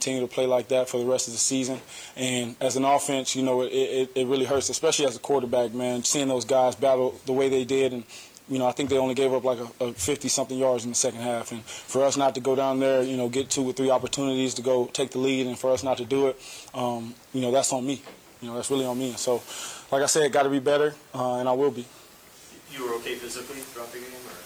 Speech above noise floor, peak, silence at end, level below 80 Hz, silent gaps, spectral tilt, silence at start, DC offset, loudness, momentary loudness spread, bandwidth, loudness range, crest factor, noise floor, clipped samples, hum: 25 dB; -10 dBFS; 0 s; -64 dBFS; none; -3.5 dB/octave; 0 s; under 0.1%; -25 LUFS; 12 LU; 17 kHz; 4 LU; 16 dB; -50 dBFS; under 0.1%; none